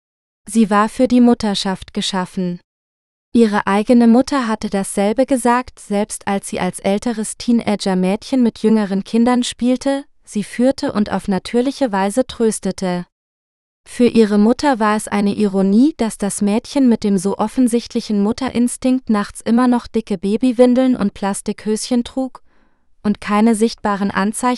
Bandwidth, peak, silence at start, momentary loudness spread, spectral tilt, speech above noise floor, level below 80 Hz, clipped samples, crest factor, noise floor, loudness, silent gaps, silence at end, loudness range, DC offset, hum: 12.5 kHz; 0 dBFS; 0.45 s; 9 LU; -5.5 dB/octave; 37 dB; -46 dBFS; under 0.1%; 16 dB; -53 dBFS; -17 LUFS; 2.64-3.32 s, 13.12-13.84 s; 0 s; 3 LU; under 0.1%; none